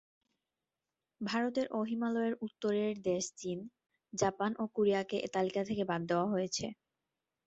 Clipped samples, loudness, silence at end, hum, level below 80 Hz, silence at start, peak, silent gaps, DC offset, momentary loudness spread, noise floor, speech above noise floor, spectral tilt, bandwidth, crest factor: under 0.1%; -35 LUFS; 0.75 s; none; -72 dBFS; 1.2 s; -16 dBFS; none; under 0.1%; 9 LU; under -90 dBFS; over 56 dB; -5 dB/octave; 8.2 kHz; 20 dB